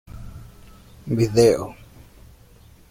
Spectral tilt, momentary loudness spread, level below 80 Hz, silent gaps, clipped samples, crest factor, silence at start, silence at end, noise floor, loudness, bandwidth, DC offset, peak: -6 dB/octave; 25 LU; -46 dBFS; none; under 0.1%; 20 dB; 0.15 s; 1.2 s; -49 dBFS; -19 LUFS; 16.5 kHz; under 0.1%; -4 dBFS